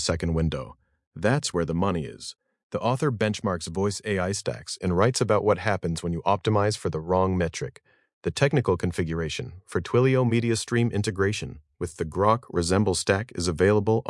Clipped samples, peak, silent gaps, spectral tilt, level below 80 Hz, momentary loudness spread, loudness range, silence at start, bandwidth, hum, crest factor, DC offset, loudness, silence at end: under 0.1%; -4 dBFS; 1.07-1.11 s, 2.63-2.70 s, 8.13-8.21 s; -5.5 dB/octave; -50 dBFS; 11 LU; 3 LU; 0 s; 12 kHz; none; 22 dB; under 0.1%; -25 LUFS; 0 s